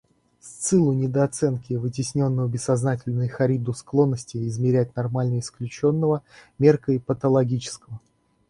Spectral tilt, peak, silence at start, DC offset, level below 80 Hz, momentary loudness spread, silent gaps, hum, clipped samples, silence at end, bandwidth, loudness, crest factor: -7 dB/octave; -4 dBFS; 0.45 s; under 0.1%; -56 dBFS; 9 LU; none; none; under 0.1%; 0.5 s; 11.5 kHz; -23 LUFS; 20 dB